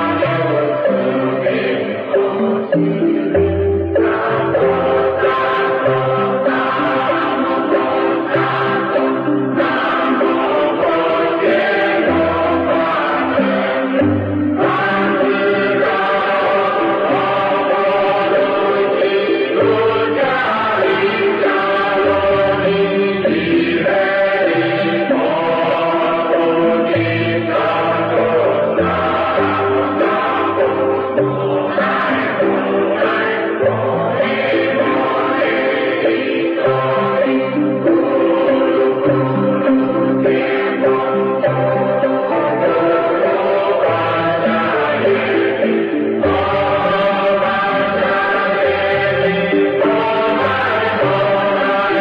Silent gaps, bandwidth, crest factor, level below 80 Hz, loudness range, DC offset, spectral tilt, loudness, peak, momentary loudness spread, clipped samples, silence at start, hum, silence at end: none; 5.4 kHz; 10 dB; -50 dBFS; 1 LU; under 0.1%; -8.5 dB/octave; -15 LUFS; -6 dBFS; 2 LU; under 0.1%; 0 s; none; 0 s